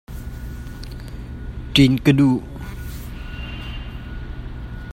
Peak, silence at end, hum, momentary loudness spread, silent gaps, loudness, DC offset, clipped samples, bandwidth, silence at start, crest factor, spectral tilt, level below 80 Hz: -2 dBFS; 0 s; none; 19 LU; none; -18 LUFS; under 0.1%; under 0.1%; 16.5 kHz; 0.1 s; 22 dB; -6.5 dB/octave; -34 dBFS